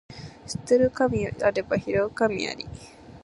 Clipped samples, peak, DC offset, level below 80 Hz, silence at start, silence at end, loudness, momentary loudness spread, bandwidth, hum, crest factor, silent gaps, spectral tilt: under 0.1%; -8 dBFS; under 0.1%; -50 dBFS; 0.1 s; 0.05 s; -25 LUFS; 18 LU; 11.5 kHz; none; 18 dB; none; -5.5 dB/octave